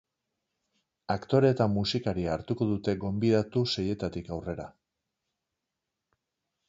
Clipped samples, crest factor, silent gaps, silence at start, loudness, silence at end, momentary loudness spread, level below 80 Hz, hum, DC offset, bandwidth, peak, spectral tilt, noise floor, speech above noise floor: under 0.1%; 20 dB; none; 1.1 s; -29 LUFS; 2 s; 12 LU; -54 dBFS; none; under 0.1%; 7.8 kHz; -10 dBFS; -7 dB/octave; -86 dBFS; 58 dB